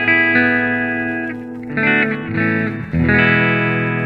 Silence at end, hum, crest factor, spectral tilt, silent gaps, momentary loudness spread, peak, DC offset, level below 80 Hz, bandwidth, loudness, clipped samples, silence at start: 0 s; none; 16 dB; -8.5 dB/octave; none; 10 LU; 0 dBFS; under 0.1%; -40 dBFS; 5.2 kHz; -15 LUFS; under 0.1%; 0 s